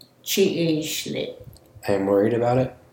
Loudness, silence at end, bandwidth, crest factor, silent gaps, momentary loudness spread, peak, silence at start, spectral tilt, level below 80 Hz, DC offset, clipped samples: -22 LUFS; 0.2 s; 17 kHz; 16 dB; none; 10 LU; -8 dBFS; 0.25 s; -5 dB/octave; -56 dBFS; under 0.1%; under 0.1%